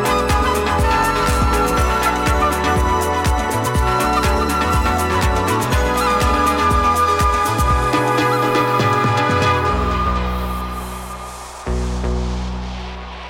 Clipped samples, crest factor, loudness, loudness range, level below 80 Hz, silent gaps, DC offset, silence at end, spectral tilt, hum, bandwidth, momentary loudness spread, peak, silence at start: under 0.1%; 12 dB; -17 LUFS; 5 LU; -24 dBFS; none; under 0.1%; 0 s; -5 dB/octave; none; 17 kHz; 10 LU; -4 dBFS; 0 s